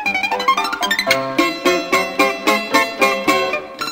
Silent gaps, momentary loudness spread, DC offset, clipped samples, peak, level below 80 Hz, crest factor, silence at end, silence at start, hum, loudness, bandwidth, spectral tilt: none; 3 LU; under 0.1%; under 0.1%; 0 dBFS; -56 dBFS; 18 dB; 0 s; 0 s; none; -16 LUFS; 16.5 kHz; -2.5 dB/octave